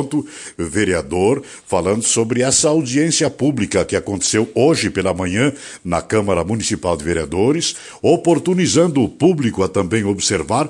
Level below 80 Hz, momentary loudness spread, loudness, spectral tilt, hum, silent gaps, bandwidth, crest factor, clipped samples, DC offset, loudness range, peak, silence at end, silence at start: -48 dBFS; 7 LU; -17 LUFS; -4.5 dB/octave; none; none; 11.5 kHz; 16 dB; under 0.1%; under 0.1%; 2 LU; -2 dBFS; 0 s; 0 s